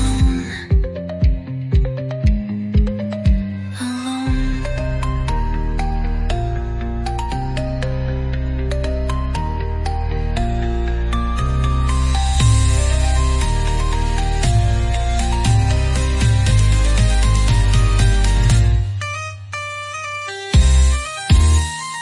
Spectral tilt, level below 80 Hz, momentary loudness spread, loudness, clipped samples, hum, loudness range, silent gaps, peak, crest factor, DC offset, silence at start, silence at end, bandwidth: -5.5 dB/octave; -18 dBFS; 9 LU; -19 LUFS; under 0.1%; none; 6 LU; none; -2 dBFS; 14 dB; under 0.1%; 0 s; 0 s; 11.5 kHz